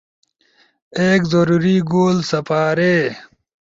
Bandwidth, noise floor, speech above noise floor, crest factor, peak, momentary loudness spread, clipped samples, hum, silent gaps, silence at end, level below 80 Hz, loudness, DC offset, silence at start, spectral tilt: 7.8 kHz; -58 dBFS; 42 dB; 14 dB; -4 dBFS; 7 LU; under 0.1%; none; none; 0.45 s; -54 dBFS; -16 LUFS; under 0.1%; 0.95 s; -6.5 dB/octave